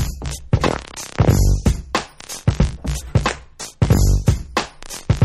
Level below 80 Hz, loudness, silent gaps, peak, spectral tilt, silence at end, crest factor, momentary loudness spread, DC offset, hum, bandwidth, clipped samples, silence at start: -24 dBFS; -20 LUFS; none; -2 dBFS; -5.5 dB/octave; 0 s; 16 dB; 14 LU; under 0.1%; none; 14 kHz; under 0.1%; 0 s